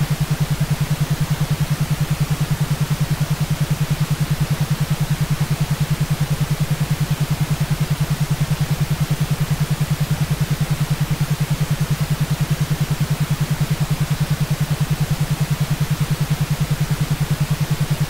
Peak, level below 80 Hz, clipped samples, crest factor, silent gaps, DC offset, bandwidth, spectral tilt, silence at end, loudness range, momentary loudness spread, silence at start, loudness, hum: -8 dBFS; -34 dBFS; under 0.1%; 12 dB; none; under 0.1%; 16.5 kHz; -6 dB/octave; 0 s; 0 LU; 0 LU; 0 s; -20 LUFS; none